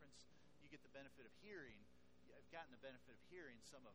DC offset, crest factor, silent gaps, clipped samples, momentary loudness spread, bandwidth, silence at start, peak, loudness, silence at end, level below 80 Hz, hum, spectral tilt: under 0.1%; 22 dB; none; under 0.1%; 8 LU; 11.5 kHz; 0 s; -42 dBFS; -62 LUFS; 0 s; -82 dBFS; none; -4 dB/octave